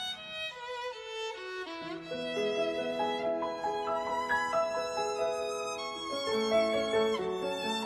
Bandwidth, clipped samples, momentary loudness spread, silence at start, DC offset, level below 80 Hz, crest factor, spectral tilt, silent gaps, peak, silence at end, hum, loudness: 13 kHz; under 0.1%; 10 LU; 0 s; under 0.1%; -66 dBFS; 16 dB; -3 dB/octave; none; -18 dBFS; 0 s; none; -33 LUFS